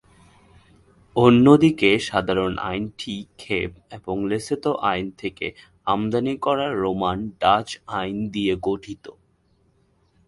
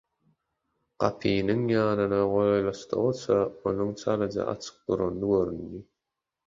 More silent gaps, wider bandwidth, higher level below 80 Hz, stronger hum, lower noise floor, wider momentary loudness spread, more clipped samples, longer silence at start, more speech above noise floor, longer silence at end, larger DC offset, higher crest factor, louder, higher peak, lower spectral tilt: neither; first, 11.5 kHz vs 7.6 kHz; first, -50 dBFS vs -56 dBFS; neither; second, -63 dBFS vs -86 dBFS; first, 16 LU vs 8 LU; neither; first, 1.15 s vs 1 s; second, 41 dB vs 60 dB; first, 1.15 s vs 0.65 s; neither; about the same, 22 dB vs 22 dB; first, -22 LUFS vs -27 LUFS; first, 0 dBFS vs -6 dBFS; about the same, -6 dB/octave vs -7 dB/octave